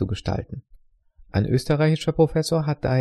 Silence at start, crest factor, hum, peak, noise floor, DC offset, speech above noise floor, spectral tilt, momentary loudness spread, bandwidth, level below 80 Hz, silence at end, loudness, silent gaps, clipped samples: 0 s; 18 dB; none; -4 dBFS; -53 dBFS; under 0.1%; 31 dB; -7 dB/octave; 10 LU; 13 kHz; -42 dBFS; 0 s; -23 LUFS; none; under 0.1%